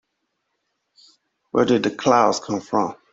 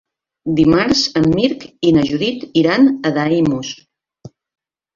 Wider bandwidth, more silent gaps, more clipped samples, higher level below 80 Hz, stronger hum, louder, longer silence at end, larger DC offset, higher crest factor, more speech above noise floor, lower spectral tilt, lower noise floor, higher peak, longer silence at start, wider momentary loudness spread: about the same, 8 kHz vs 7.4 kHz; neither; neither; second, -62 dBFS vs -46 dBFS; neither; second, -20 LUFS vs -15 LUFS; second, 0.2 s vs 0.65 s; neither; about the same, 20 dB vs 16 dB; first, 56 dB vs 27 dB; about the same, -5 dB/octave vs -5.5 dB/octave; first, -75 dBFS vs -41 dBFS; about the same, -2 dBFS vs -2 dBFS; first, 1.55 s vs 0.45 s; about the same, 8 LU vs 9 LU